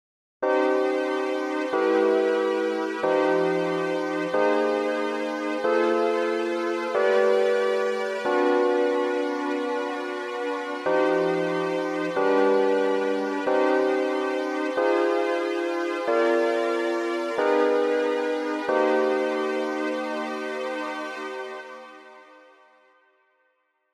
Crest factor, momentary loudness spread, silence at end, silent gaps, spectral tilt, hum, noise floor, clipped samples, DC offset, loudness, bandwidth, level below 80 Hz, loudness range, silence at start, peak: 16 dB; 8 LU; 1.7 s; none; -5 dB/octave; none; -71 dBFS; under 0.1%; under 0.1%; -24 LUFS; 12 kHz; -82 dBFS; 4 LU; 0.4 s; -10 dBFS